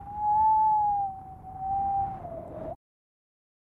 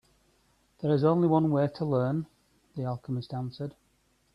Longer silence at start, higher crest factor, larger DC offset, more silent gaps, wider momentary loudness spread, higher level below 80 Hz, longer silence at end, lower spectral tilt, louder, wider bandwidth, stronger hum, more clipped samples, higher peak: second, 0 s vs 0.8 s; second, 12 dB vs 18 dB; neither; neither; first, 19 LU vs 16 LU; first, -52 dBFS vs -66 dBFS; first, 1 s vs 0.65 s; about the same, -9.5 dB/octave vs -10 dB/octave; about the same, -26 LUFS vs -28 LUFS; second, 2.7 kHz vs 5.8 kHz; neither; neither; second, -18 dBFS vs -12 dBFS